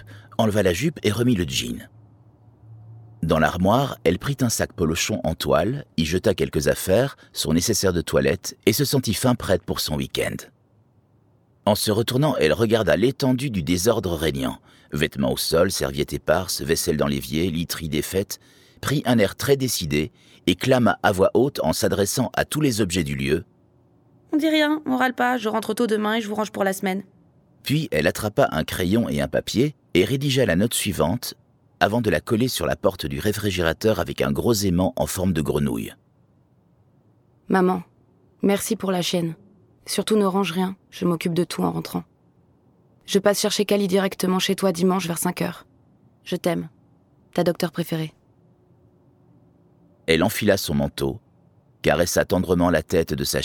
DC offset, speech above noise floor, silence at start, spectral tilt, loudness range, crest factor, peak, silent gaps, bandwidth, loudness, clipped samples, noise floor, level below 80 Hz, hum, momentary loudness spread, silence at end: under 0.1%; 38 dB; 0 s; -5 dB/octave; 4 LU; 22 dB; -2 dBFS; none; 19 kHz; -22 LUFS; under 0.1%; -59 dBFS; -44 dBFS; none; 8 LU; 0 s